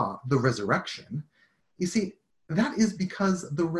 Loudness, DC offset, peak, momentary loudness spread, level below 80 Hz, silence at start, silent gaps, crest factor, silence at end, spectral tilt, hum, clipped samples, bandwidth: -28 LUFS; under 0.1%; -8 dBFS; 11 LU; -60 dBFS; 0 s; none; 20 dB; 0 s; -6 dB/octave; none; under 0.1%; 12 kHz